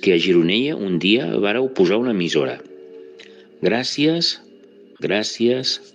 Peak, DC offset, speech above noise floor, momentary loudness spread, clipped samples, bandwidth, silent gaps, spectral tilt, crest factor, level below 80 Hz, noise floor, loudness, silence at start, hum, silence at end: -4 dBFS; under 0.1%; 28 dB; 7 LU; under 0.1%; 9.8 kHz; none; -5 dB/octave; 16 dB; -70 dBFS; -47 dBFS; -19 LUFS; 0 s; none; 0.15 s